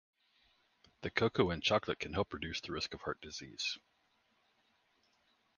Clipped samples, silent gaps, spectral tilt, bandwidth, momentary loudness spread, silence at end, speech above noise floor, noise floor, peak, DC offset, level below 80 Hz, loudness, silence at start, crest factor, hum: under 0.1%; none; -4.5 dB/octave; 10 kHz; 12 LU; 1.8 s; 39 dB; -76 dBFS; -14 dBFS; under 0.1%; -60 dBFS; -37 LUFS; 1 s; 26 dB; none